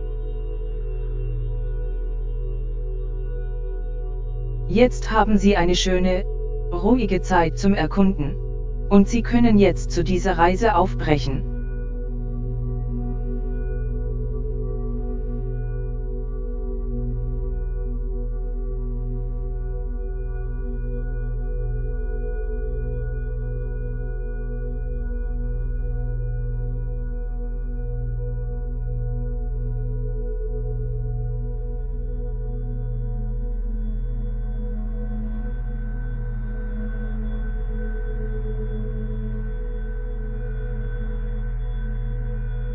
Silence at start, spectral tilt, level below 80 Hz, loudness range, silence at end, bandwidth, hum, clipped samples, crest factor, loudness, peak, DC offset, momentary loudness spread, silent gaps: 0 s; -6.5 dB/octave; -26 dBFS; 11 LU; 0 s; 7.6 kHz; none; under 0.1%; 22 dB; -26 LUFS; -2 dBFS; under 0.1%; 12 LU; none